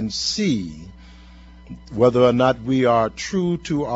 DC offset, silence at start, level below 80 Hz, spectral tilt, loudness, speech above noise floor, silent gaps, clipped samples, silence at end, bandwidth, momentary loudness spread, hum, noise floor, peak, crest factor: under 0.1%; 0 s; -46 dBFS; -5.5 dB/octave; -19 LUFS; 24 dB; none; under 0.1%; 0 s; 8 kHz; 19 LU; none; -43 dBFS; -2 dBFS; 18 dB